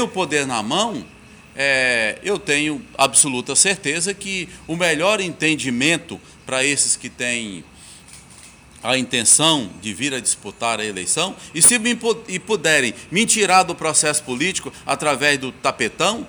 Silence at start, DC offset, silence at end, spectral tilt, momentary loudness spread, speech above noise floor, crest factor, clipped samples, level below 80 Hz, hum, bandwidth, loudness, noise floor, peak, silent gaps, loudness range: 0 s; under 0.1%; 0 s; -1.5 dB/octave; 11 LU; 24 dB; 18 dB; under 0.1%; -54 dBFS; none; over 20 kHz; -18 LUFS; -44 dBFS; -2 dBFS; none; 4 LU